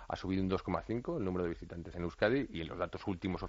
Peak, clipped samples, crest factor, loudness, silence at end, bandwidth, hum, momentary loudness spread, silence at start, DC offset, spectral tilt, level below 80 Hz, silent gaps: -16 dBFS; under 0.1%; 20 dB; -37 LUFS; 0 s; 7.6 kHz; none; 9 LU; 0 s; under 0.1%; -5.5 dB/octave; -54 dBFS; none